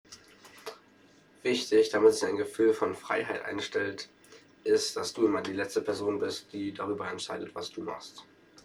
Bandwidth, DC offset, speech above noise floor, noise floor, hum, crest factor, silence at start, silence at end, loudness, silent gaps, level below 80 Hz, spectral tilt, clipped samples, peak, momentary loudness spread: 13.5 kHz; under 0.1%; 30 dB; -60 dBFS; none; 20 dB; 0.1 s; 0.4 s; -30 LUFS; none; -72 dBFS; -3.5 dB/octave; under 0.1%; -10 dBFS; 18 LU